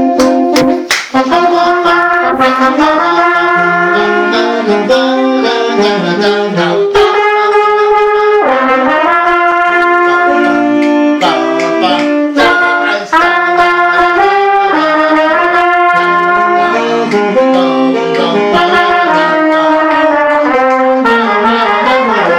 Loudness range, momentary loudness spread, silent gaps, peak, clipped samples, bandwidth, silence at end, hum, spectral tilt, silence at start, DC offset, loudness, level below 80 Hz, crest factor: 1 LU; 3 LU; none; 0 dBFS; under 0.1%; 17 kHz; 0 s; none; -4.5 dB/octave; 0 s; under 0.1%; -9 LUFS; -46 dBFS; 8 dB